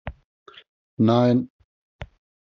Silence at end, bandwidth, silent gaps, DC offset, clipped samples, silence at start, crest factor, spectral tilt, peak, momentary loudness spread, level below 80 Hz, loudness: 0.35 s; 6.4 kHz; 0.24-0.46 s, 0.69-0.97 s, 1.50-1.99 s; under 0.1%; under 0.1%; 0.05 s; 20 dB; -7.5 dB/octave; -6 dBFS; 25 LU; -50 dBFS; -20 LUFS